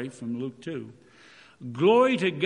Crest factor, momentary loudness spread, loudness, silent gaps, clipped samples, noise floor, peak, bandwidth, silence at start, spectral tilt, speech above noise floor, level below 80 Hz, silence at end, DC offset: 18 dB; 21 LU; -24 LUFS; none; under 0.1%; -54 dBFS; -8 dBFS; 10.5 kHz; 0 s; -6.5 dB/octave; 28 dB; -76 dBFS; 0 s; under 0.1%